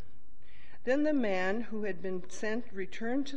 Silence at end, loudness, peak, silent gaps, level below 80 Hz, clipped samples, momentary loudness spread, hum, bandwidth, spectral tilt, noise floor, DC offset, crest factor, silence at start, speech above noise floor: 0 s; -34 LUFS; -16 dBFS; none; -64 dBFS; under 0.1%; 10 LU; none; 9 kHz; -5.5 dB/octave; -60 dBFS; 3%; 16 dB; 0.6 s; 27 dB